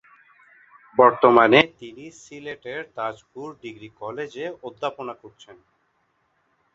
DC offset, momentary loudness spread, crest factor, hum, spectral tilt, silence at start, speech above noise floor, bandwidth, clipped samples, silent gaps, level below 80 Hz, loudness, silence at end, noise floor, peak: under 0.1%; 25 LU; 24 dB; none; -5.5 dB/octave; 0.95 s; 46 dB; 7.8 kHz; under 0.1%; none; -66 dBFS; -20 LUFS; 1.45 s; -69 dBFS; 0 dBFS